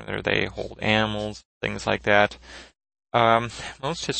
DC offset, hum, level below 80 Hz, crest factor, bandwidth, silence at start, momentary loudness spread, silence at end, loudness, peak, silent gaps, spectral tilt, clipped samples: under 0.1%; none; -48 dBFS; 24 dB; 8.8 kHz; 0 s; 13 LU; 0 s; -24 LUFS; -2 dBFS; 1.45-1.61 s; -4.5 dB/octave; under 0.1%